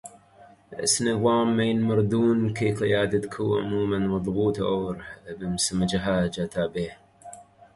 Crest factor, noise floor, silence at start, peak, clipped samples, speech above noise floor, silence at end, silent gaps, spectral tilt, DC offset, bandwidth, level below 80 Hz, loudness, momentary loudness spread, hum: 16 dB; -53 dBFS; 0.05 s; -10 dBFS; under 0.1%; 29 dB; 0.35 s; none; -5 dB/octave; under 0.1%; 11.5 kHz; -50 dBFS; -25 LUFS; 13 LU; none